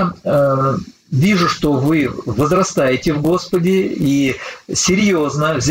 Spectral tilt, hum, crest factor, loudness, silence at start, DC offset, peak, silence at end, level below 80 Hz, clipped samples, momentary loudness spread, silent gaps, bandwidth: -5 dB/octave; none; 12 dB; -16 LUFS; 0 s; under 0.1%; -4 dBFS; 0 s; -42 dBFS; under 0.1%; 6 LU; none; 16.5 kHz